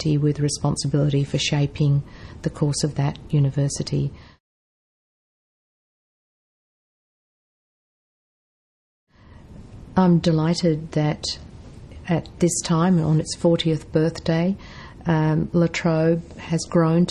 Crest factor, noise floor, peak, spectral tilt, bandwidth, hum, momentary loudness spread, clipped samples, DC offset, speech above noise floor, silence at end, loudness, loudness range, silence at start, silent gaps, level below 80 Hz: 18 dB; -45 dBFS; -4 dBFS; -6 dB/octave; 11.5 kHz; none; 9 LU; under 0.1%; under 0.1%; 24 dB; 0 s; -22 LUFS; 6 LU; 0 s; 4.40-9.07 s; -46 dBFS